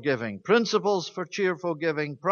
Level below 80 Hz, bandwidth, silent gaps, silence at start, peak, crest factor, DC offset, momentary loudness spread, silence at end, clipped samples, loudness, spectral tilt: -74 dBFS; 7.2 kHz; none; 0 s; -8 dBFS; 18 dB; under 0.1%; 6 LU; 0 s; under 0.1%; -26 LUFS; -5 dB/octave